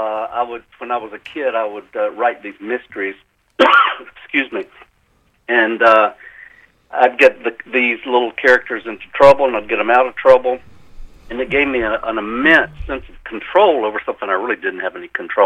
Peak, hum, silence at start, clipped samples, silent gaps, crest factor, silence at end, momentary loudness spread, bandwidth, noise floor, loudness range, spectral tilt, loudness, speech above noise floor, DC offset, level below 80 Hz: 0 dBFS; none; 0 s; under 0.1%; none; 16 dB; 0 s; 16 LU; 8.6 kHz; -58 dBFS; 4 LU; -5 dB/octave; -16 LUFS; 43 dB; under 0.1%; -44 dBFS